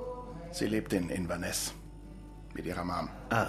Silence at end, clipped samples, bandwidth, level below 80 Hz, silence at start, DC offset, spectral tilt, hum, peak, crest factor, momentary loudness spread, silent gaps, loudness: 0 s; under 0.1%; 14 kHz; -50 dBFS; 0 s; under 0.1%; -4.5 dB/octave; none; -12 dBFS; 22 dB; 17 LU; none; -35 LUFS